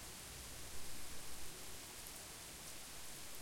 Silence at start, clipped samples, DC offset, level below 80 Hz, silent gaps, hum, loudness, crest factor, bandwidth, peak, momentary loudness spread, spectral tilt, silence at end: 0 s; under 0.1%; under 0.1%; -62 dBFS; none; none; -50 LUFS; 14 dB; 16.5 kHz; -32 dBFS; 0 LU; -1.5 dB/octave; 0 s